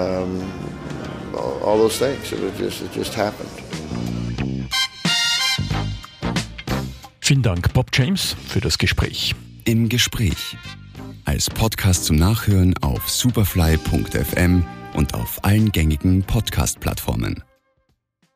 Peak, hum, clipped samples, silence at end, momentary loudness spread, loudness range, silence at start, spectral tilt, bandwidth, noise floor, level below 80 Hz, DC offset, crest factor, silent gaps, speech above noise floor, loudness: -6 dBFS; none; under 0.1%; 0.95 s; 12 LU; 4 LU; 0 s; -4.5 dB/octave; 15.5 kHz; -67 dBFS; -32 dBFS; under 0.1%; 16 dB; none; 48 dB; -20 LUFS